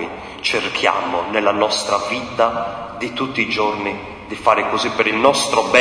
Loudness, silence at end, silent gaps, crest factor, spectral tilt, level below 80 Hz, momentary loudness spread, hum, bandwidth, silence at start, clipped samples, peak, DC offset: -18 LUFS; 0 s; none; 18 dB; -3 dB/octave; -50 dBFS; 11 LU; none; 10.5 kHz; 0 s; under 0.1%; 0 dBFS; under 0.1%